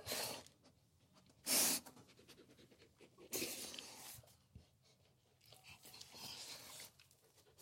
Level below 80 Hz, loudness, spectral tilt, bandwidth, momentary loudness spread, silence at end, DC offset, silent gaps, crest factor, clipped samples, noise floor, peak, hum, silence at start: -80 dBFS; -42 LUFS; -0.5 dB/octave; 16.5 kHz; 28 LU; 0 s; under 0.1%; none; 26 dB; under 0.1%; -74 dBFS; -22 dBFS; none; 0 s